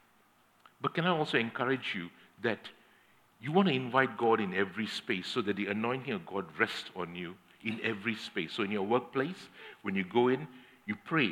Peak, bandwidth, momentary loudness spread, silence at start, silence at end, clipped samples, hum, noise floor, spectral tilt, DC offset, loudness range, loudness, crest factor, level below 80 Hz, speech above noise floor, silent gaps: -10 dBFS; 15.5 kHz; 13 LU; 0.8 s; 0 s; under 0.1%; none; -67 dBFS; -6 dB/octave; under 0.1%; 4 LU; -33 LUFS; 22 dB; -84 dBFS; 34 dB; none